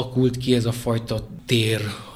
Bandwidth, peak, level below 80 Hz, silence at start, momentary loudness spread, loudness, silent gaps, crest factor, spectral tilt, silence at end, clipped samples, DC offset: 15.5 kHz; -4 dBFS; -46 dBFS; 0 s; 7 LU; -23 LUFS; none; 18 dB; -6 dB/octave; 0 s; under 0.1%; under 0.1%